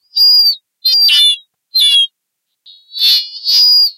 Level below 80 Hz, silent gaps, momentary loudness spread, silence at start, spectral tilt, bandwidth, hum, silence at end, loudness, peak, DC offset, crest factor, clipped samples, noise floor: -76 dBFS; none; 10 LU; 0.15 s; 5.5 dB/octave; 16 kHz; none; 0.05 s; -8 LUFS; 0 dBFS; under 0.1%; 12 dB; under 0.1%; -73 dBFS